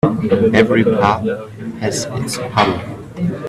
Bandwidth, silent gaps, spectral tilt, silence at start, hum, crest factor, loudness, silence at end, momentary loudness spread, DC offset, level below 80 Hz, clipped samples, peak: 14 kHz; none; -5.5 dB/octave; 0.05 s; none; 16 dB; -16 LUFS; 0 s; 13 LU; under 0.1%; -46 dBFS; under 0.1%; 0 dBFS